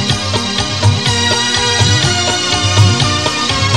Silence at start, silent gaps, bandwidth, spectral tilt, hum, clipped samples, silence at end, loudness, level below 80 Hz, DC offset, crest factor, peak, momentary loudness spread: 0 s; none; 12 kHz; -3.5 dB/octave; none; under 0.1%; 0 s; -12 LUFS; -34 dBFS; 1%; 12 dB; 0 dBFS; 4 LU